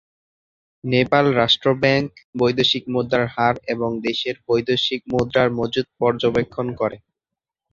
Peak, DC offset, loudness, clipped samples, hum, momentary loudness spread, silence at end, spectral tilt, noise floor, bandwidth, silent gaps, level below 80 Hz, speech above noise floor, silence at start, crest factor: -2 dBFS; under 0.1%; -20 LUFS; under 0.1%; none; 8 LU; 0.75 s; -6 dB/octave; -86 dBFS; 7.6 kHz; 2.24-2.33 s; -52 dBFS; 66 dB; 0.85 s; 20 dB